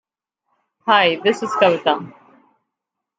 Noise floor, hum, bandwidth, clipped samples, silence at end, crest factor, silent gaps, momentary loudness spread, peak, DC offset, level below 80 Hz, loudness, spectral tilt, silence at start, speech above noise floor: -82 dBFS; none; 9.2 kHz; under 0.1%; 1.1 s; 18 dB; none; 12 LU; -2 dBFS; under 0.1%; -72 dBFS; -17 LUFS; -4.5 dB/octave; 0.85 s; 65 dB